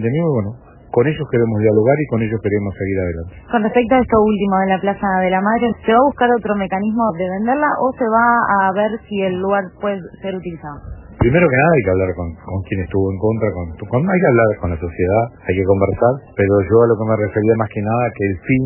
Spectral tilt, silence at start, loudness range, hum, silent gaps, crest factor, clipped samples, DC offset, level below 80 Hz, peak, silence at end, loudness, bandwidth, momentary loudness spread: -12 dB/octave; 0 s; 2 LU; none; none; 16 dB; under 0.1%; under 0.1%; -40 dBFS; 0 dBFS; 0 s; -16 LUFS; 3.1 kHz; 10 LU